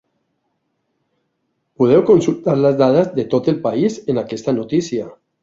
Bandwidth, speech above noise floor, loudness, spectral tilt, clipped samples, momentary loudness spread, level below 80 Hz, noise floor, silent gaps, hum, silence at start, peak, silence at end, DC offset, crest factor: 7.8 kHz; 55 dB; -16 LUFS; -7.5 dB/octave; under 0.1%; 9 LU; -56 dBFS; -70 dBFS; none; none; 1.8 s; -2 dBFS; 0.3 s; under 0.1%; 16 dB